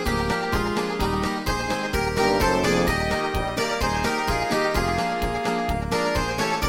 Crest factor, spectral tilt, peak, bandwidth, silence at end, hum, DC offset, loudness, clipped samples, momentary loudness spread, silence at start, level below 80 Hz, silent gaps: 14 dB; -4.5 dB/octave; -8 dBFS; 17 kHz; 0 s; none; under 0.1%; -23 LUFS; under 0.1%; 5 LU; 0 s; -34 dBFS; none